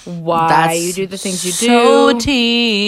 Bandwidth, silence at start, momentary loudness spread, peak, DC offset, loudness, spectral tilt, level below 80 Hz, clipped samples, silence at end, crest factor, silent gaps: 16 kHz; 0.05 s; 10 LU; 0 dBFS; under 0.1%; -13 LUFS; -3.5 dB/octave; -42 dBFS; under 0.1%; 0 s; 14 dB; none